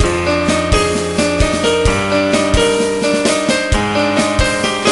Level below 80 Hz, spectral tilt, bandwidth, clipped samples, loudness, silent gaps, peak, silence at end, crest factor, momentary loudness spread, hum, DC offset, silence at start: -24 dBFS; -4 dB/octave; 11.5 kHz; under 0.1%; -14 LUFS; none; 0 dBFS; 0 s; 14 dB; 2 LU; none; under 0.1%; 0 s